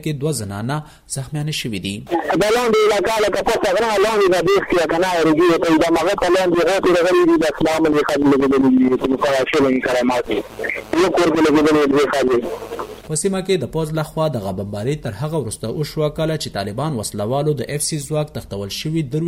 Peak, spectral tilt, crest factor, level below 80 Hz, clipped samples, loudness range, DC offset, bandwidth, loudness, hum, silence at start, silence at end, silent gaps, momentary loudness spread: -6 dBFS; -5 dB/octave; 12 dB; -44 dBFS; under 0.1%; 7 LU; under 0.1%; 16 kHz; -18 LUFS; none; 0 s; 0 s; none; 10 LU